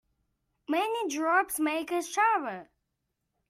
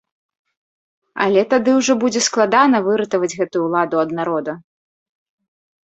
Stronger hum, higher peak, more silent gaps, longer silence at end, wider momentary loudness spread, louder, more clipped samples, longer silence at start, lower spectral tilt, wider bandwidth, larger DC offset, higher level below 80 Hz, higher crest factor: neither; second, -12 dBFS vs 0 dBFS; neither; second, 0.85 s vs 1.25 s; about the same, 11 LU vs 9 LU; second, -28 LUFS vs -17 LUFS; neither; second, 0.7 s vs 1.15 s; second, -2 dB/octave vs -4 dB/octave; first, 16 kHz vs 8.4 kHz; neither; second, -74 dBFS vs -64 dBFS; about the same, 18 dB vs 18 dB